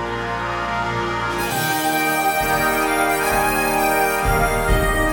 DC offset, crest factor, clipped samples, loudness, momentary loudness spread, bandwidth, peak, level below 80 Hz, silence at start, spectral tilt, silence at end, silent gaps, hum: under 0.1%; 14 dB; under 0.1%; -19 LUFS; 5 LU; 19 kHz; -6 dBFS; -30 dBFS; 0 s; -4 dB/octave; 0 s; none; none